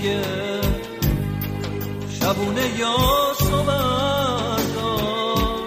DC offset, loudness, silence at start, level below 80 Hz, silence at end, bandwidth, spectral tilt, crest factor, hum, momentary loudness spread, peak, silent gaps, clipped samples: under 0.1%; -22 LUFS; 0 s; -32 dBFS; 0 s; 15.5 kHz; -5 dB/octave; 16 dB; none; 8 LU; -6 dBFS; none; under 0.1%